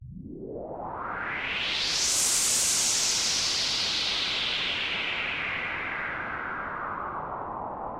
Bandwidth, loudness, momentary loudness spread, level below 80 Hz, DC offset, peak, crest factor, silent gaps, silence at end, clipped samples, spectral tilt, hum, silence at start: 16 kHz; -26 LUFS; 14 LU; -54 dBFS; under 0.1%; -12 dBFS; 18 dB; none; 0 s; under 0.1%; 0 dB/octave; none; 0 s